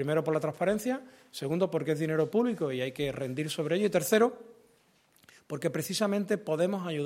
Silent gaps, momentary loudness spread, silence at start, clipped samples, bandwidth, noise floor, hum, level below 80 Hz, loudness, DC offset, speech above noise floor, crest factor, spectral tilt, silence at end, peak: none; 9 LU; 0 s; under 0.1%; 16.5 kHz; -66 dBFS; none; -68 dBFS; -30 LUFS; under 0.1%; 36 dB; 18 dB; -5.5 dB/octave; 0 s; -12 dBFS